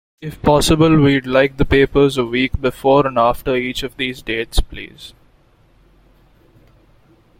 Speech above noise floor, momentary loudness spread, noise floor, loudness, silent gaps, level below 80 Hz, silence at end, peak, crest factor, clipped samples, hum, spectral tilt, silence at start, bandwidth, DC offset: 37 dB; 11 LU; -53 dBFS; -16 LUFS; none; -30 dBFS; 2.3 s; 0 dBFS; 16 dB; under 0.1%; none; -5.5 dB/octave; 0.2 s; 16.5 kHz; under 0.1%